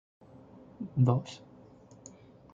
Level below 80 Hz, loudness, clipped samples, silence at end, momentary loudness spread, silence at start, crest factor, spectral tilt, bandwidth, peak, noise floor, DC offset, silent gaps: -68 dBFS; -29 LUFS; under 0.1%; 1.2 s; 27 LU; 0.8 s; 22 dB; -8 dB/octave; 7.6 kHz; -12 dBFS; -55 dBFS; under 0.1%; none